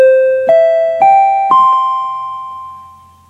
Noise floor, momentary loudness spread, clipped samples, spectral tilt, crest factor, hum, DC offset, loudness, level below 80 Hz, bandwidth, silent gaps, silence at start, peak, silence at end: -38 dBFS; 17 LU; under 0.1%; -4.5 dB/octave; 10 dB; none; under 0.1%; -10 LUFS; -62 dBFS; 7.8 kHz; none; 0 s; 0 dBFS; 0.45 s